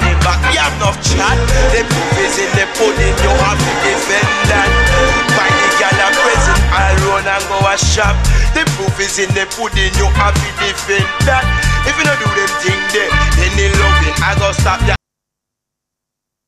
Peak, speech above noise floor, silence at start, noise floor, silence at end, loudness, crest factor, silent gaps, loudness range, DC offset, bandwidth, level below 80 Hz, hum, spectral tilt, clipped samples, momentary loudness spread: 0 dBFS; 67 dB; 0 s; -80 dBFS; 1.5 s; -12 LUFS; 12 dB; none; 3 LU; under 0.1%; 15 kHz; -18 dBFS; none; -3.5 dB/octave; under 0.1%; 4 LU